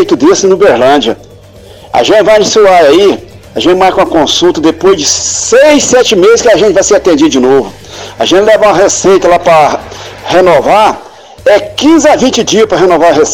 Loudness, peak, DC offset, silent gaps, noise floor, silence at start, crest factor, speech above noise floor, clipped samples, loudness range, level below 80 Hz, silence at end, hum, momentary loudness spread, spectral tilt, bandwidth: -6 LUFS; 0 dBFS; under 0.1%; none; -32 dBFS; 0 s; 6 dB; 27 dB; under 0.1%; 2 LU; -38 dBFS; 0 s; none; 9 LU; -3 dB/octave; 17 kHz